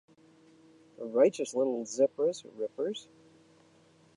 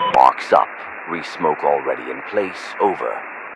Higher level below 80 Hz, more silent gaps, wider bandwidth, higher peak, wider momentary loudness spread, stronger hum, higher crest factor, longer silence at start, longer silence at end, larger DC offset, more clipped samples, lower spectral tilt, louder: second, -86 dBFS vs -62 dBFS; neither; about the same, 11 kHz vs 11.5 kHz; second, -12 dBFS vs 0 dBFS; about the same, 12 LU vs 13 LU; neither; about the same, 20 dB vs 20 dB; first, 1 s vs 0 s; first, 1.15 s vs 0 s; neither; second, under 0.1% vs 0.1%; about the same, -4.5 dB/octave vs -4.5 dB/octave; second, -30 LUFS vs -19 LUFS